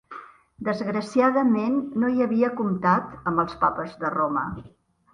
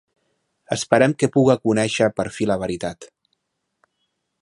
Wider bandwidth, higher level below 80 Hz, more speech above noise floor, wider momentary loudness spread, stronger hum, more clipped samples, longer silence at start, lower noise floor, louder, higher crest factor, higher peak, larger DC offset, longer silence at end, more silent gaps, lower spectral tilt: second, 10 kHz vs 11.5 kHz; about the same, -56 dBFS vs -54 dBFS; second, 20 dB vs 55 dB; about the same, 10 LU vs 12 LU; neither; neither; second, 0.1 s vs 0.7 s; second, -44 dBFS vs -74 dBFS; second, -24 LUFS vs -20 LUFS; about the same, 18 dB vs 22 dB; second, -8 dBFS vs 0 dBFS; neither; second, 0.45 s vs 1.35 s; neither; first, -7.5 dB/octave vs -5.5 dB/octave